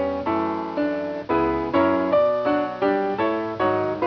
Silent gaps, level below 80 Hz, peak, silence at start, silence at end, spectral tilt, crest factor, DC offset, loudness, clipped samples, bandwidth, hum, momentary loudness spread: none; -50 dBFS; -8 dBFS; 0 s; 0 s; -8 dB/octave; 14 dB; under 0.1%; -22 LUFS; under 0.1%; 5.4 kHz; none; 6 LU